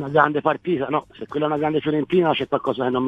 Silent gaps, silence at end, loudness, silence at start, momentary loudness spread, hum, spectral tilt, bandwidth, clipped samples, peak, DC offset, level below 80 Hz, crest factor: none; 0 s; -22 LUFS; 0 s; 7 LU; none; -8 dB/octave; 6 kHz; under 0.1%; 0 dBFS; under 0.1%; -58 dBFS; 20 dB